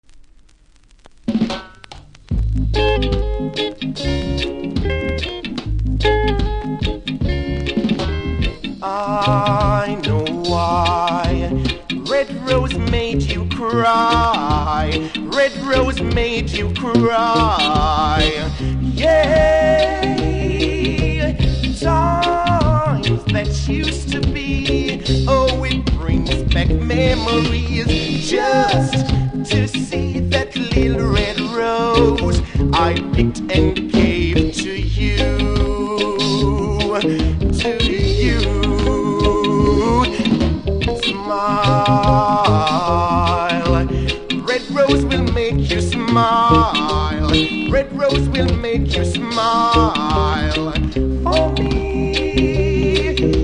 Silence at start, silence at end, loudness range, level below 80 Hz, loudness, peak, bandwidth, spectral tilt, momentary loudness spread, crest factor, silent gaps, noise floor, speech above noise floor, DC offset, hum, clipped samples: 0.1 s; 0 s; 5 LU; -24 dBFS; -17 LUFS; 0 dBFS; 10.5 kHz; -6 dB/octave; 7 LU; 16 dB; none; -49 dBFS; 33 dB; under 0.1%; none; under 0.1%